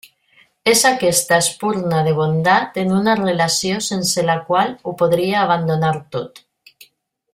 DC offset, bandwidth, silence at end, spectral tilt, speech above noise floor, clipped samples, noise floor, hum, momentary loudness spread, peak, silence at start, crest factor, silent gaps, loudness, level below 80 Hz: under 0.1%; 16 kHz; 0.95 s; -4 dB/octave; 38 dB; under 0.1%; -55 dBFS; none; 7 LU; 0 dBFS; 0.65 s; 18 dB; none; -17 LUFS; -56 dBFS